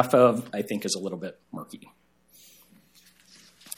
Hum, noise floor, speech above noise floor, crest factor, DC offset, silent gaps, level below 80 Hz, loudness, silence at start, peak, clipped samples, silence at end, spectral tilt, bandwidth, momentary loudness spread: none; -59 dBFS; 33 dB; 24 dB; under 0.1%; none; -74 dBFS; -26 LUFS; 0 s; -4 dBFS; under 0.1%; 0.05 s; -5 dB/octave; 17 kHz; 23 LU